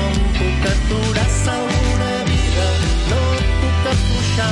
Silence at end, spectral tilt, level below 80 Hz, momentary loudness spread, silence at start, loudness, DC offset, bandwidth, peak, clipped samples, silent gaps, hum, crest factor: 0 s; -5 dB/octave; -20 dBFS; 1 LU; 0 s; -18 LUFS; under 0.1%; 11.5 kHz; -4 dBFS; under 0.1%; none; none; 12 dB